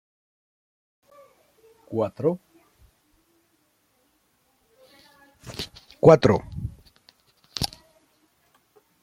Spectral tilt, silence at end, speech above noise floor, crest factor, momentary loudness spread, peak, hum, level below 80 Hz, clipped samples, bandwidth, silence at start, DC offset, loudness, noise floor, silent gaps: -6.5 dB/octave; 1.35 s; 49 dB; 26 dB; 21 LU; -2 dBFS; none; -52 dBFS; under 0.1%; 15.5 kHz; 1.9 s; under 0.1%; -23 LUFS; -68 dBFS; none